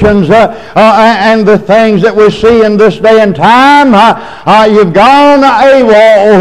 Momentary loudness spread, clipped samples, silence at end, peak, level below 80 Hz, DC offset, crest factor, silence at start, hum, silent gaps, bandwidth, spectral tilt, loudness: 4 LU; 9%; 0 s; 0 dBFS; -32 dBFS; under 0.1%; 4 dB; 0 s; none; none; 12 kHz; -6 dB/octave; -4 LUFS